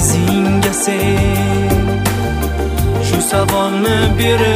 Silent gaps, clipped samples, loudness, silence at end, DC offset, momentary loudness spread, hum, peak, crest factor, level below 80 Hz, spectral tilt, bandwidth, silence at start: none; under 0.1%; -14 LUFS; 0 s; under 0.1%; 4 LU; none; -2 dBFS; 12 dB; -24 dBFS; -5 dB/octave; 16 kHz; 0 s